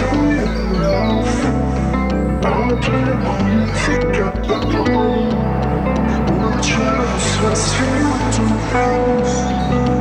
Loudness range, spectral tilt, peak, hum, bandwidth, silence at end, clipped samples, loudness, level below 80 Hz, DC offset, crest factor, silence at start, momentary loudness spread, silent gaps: 1 LU; -5.5 dB/octave; -4 dBFS; none; 11 kHz; 0 s; under 0.1%; -17 LUFS; -24 dBFS; under 0.1%; 12 dB; 0 s; 2 LU; none